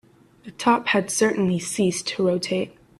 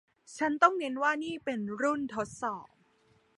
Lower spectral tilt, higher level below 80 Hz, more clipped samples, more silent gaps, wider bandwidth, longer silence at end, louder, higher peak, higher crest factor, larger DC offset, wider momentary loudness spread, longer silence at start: about the same, -4 dB/octave vs -4.5 dB/octave; first, -62 dBFS vs -72 dBFS; neither; neither; first, 14 kHz vs 11.5 kHz; second, 0.3 s vs 0.7 s; first, -22 LUFS vs -31 LUFS; about the same, -6 dBFS vs -8 dBFS; second, 18 dB vs 24 dB; neither; second, 5 LU vs 12 LU; first, 0.45 s vs 0.3 s